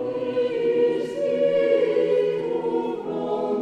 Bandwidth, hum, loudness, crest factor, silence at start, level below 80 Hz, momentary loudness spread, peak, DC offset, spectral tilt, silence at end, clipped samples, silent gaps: 8.6 kHz; none; -23 LUFS; 14 dB; 0 s; -70 dBFS; 6 LU; -8 dBFS; under 0.1%; -6.5 dB/octave; 0 s; under 0.1%; none